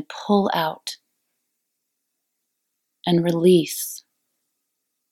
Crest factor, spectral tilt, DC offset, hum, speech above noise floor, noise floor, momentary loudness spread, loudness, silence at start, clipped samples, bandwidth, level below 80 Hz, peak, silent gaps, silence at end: 20 dB; -5.5 dB/octave; under 0.1%; none; 58 dB; -78 dBFS; 17 LU; -21 LUFS; 0 s; under 0.1%; 16.5 kHz; -74 dBFS; -4 dBFS; none; 1.1 s